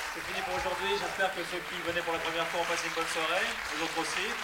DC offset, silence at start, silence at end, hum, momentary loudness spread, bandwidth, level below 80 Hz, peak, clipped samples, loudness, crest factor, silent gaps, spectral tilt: under 0.1%; 0 s; 0 s; none; 5 LU; 16.5 kHz; -58 dBFS; -16 dBFS; under 0.1%; -31 LUFS; 16 dB; none; -2 dB/octave